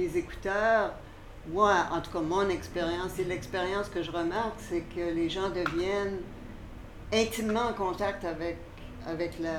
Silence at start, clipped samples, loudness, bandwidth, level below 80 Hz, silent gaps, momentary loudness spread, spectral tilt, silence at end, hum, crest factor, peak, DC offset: 0 s; under 0.1%; -31 LUFS; 18.5 kHz; -48 dBFS; none; 18 LU; -5 dB/octave; 0 s; none; 18 dB; -12 dBFS; under 0.1%